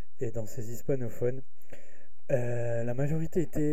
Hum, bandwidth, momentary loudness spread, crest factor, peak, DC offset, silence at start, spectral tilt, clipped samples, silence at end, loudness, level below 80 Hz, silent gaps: none; 15.5 kHz; 8 LU; 18 dB; -14 dBFS; 4%; 0.2 s; -8 dB/octave; under 0.1%; 0 s; -33 LUFS; -52 dBFS; none